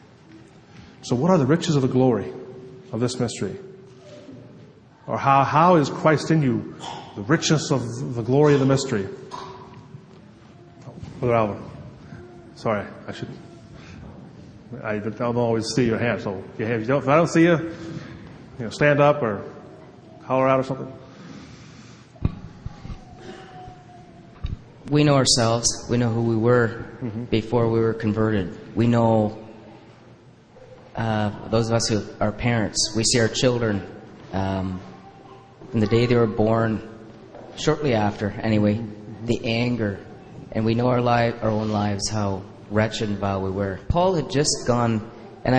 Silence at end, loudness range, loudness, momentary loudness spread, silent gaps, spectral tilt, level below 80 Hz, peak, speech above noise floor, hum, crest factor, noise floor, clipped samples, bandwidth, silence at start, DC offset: 0 s; 8 LU; -22 LUFS; 23 LU; none; -5.5 dB/octave; -46 dBFS; -2 dBFS; 28 dB; none; 20 dB; -49 dBFS; under 0.1%; 10 kHz; 0.35 s; under 0.1%